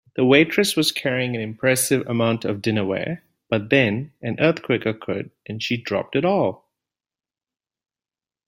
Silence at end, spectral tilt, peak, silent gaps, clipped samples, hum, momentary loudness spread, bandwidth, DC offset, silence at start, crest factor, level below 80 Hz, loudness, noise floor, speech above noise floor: 1.9 s; -4.5 dB/octave; -2 dBFS; none; under 0.1%; none; 12 LU; 16 kHz; under 0.1%; 0.15 s; 20 dB; -60 dBFS; -21 LUFS; under -90 dBFS; over 69 dB